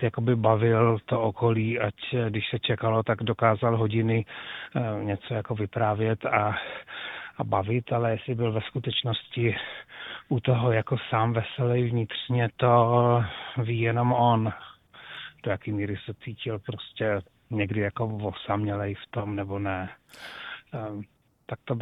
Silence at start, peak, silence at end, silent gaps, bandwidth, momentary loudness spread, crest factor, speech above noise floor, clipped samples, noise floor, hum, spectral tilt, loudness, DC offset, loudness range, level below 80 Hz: 0 s; -6 dBFS; 0 s; none; 4.1 kHz; 15 LU; 20 dB; 19 dB; under 0.1%; -46 dBFS; none; -9 dB/octave; -27 LUFS; under 0.1%; 7 LU; -60 dBFS